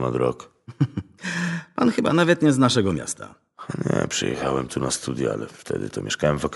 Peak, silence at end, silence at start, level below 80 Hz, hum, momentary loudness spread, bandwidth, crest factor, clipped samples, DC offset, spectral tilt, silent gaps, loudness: -4 dBFS; 0 s; 0 s; -50 dBFS; none; 14 LU; 11.5 kHz; 20 dB; under 0.1%; under 0.1%; -5 dB/octave; none; -23 LUFS